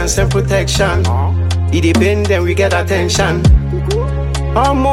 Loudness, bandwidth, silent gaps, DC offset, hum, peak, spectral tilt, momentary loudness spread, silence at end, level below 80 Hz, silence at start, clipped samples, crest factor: -14 LUFS; 14 kHz; none; under 0.1%; none; 0 dBFS; -5.5 dB/octave; 5 LU; 0 s; -20 dBFS; 0 s; under 0.1%; 12 dB